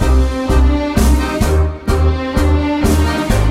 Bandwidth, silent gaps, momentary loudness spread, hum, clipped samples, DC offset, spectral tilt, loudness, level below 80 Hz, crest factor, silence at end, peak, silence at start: 15.5 kHz; none; 2 LU; none; under 0.1%; under 0.1%; -6.5 dB/octave; -15 LUFS; -14 dBFS; 12 dB; 0 s; 0 dBFS; 0 s